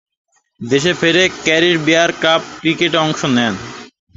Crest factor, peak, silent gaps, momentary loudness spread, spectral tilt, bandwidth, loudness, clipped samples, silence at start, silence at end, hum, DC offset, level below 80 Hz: 16 dB; 0 dBFS; none; 12 LU; -4 dB/octave; 8 kHz; -14 LUFS; under 0.1%; 0.6 s; 0.3 s; none; under 0.1%; -52 dBFS